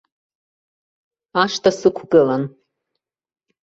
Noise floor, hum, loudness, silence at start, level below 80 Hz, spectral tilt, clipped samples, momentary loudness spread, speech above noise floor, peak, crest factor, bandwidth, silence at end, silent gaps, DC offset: -80 dBFS; none; -18 LUFS; 1.35 s; -62 dBFS; -5 dB/octave; under 0.1%; 9 LU; 63 dB; -2 dBFS; 20 dB; 8 kHz; 1.15 s; none; under 0.1%